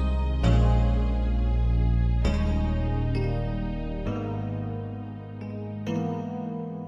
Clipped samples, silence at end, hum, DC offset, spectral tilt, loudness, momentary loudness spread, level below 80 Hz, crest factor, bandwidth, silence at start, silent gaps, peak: under 0.1%; 0 s; none; under 0.1%; -8.5 dB/octave; -27 LUFS; 12 LU; -28 dBFS; 16 dB; 8 kHz; 0 s; none; -10 dBFS